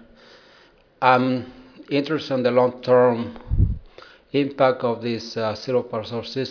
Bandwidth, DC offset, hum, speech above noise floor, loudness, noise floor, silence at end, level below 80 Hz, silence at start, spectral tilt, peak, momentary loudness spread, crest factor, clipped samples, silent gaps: 5.4 kHz; under 0.1%; none; 33 dB; -22 LUFS; -54 dBFS; 0 s; -36 dBFS; 1 s; -7 dB/octave; 0 dBFS; 11 LU; 22 dB; under 0.1%; none